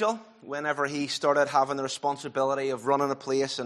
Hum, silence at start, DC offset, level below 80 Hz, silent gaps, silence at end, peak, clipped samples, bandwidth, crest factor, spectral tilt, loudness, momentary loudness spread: none; 0 s; under 0.1%; -76 dBFS; none; 0 s; -10 dBFS; under 0.1%; 13 kHz; 18 dB; -4 dB/octave; -27 LUFS; 7 LU